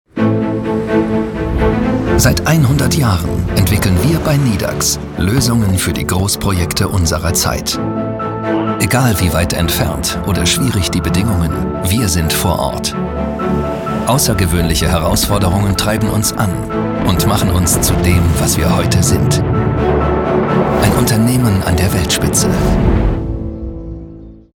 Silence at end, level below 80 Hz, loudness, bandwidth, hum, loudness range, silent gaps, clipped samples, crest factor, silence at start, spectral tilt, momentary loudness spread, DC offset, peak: 0.2 s; -26 dBFS; -14 LUFS; 19 kHz; none; 2 LU; none; under 0.1%; 14 dB; 0.15 s; -5 dB/octave; 6 LU; under 0.1%; 0 dBFS